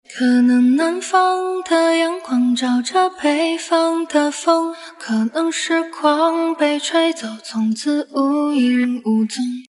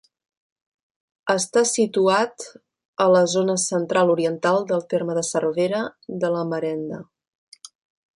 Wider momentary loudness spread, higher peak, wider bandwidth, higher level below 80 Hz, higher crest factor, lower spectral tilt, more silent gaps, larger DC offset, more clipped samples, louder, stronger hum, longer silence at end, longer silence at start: second, 6 LU vs 12 LU; about the same, -2 dBFS vs -4 dBFS; about the same, 11.5 kHz vs 11.5 kHz; about the same, -74 dBFS vs -70 dBFS; about the same, 14 dB vs 18 dB; about the same, -3.5 dB/octave vs -4 dB/octave; second, none vs 2.85-2.94 s; neither; neither; first, -18 LUFS vs -21 LUFS; neither; second, 0.1 s vs 1.1 s; second, 0.1 s vs 1.25 s